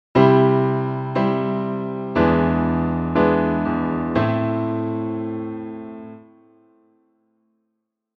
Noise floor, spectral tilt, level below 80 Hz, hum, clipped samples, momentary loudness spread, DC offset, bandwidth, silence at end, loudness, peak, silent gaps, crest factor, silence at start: -77 dBFS; -9.5 dB/octave; -44 dBFS; none; under 0.1%; 15 LU; under 0.1%; 6 kHz; 2 s; -20 LUFS; -2 dBFS; none; 20 dB; 0.15 s